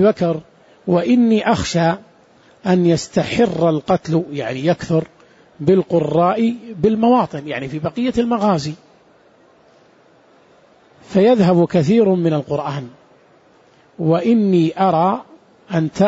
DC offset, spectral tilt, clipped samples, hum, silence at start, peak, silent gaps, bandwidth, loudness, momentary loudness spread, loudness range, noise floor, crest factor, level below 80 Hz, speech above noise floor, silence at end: under 0.1%; -7 dB/octave; under 0.1%; none; 0 s; -2 dBFS; none; 8 kHz; -17 LUFS; 11 LU; 4 LU; -51 dBFS; 16 dB; -50 dBFS; 36 dB; 0 s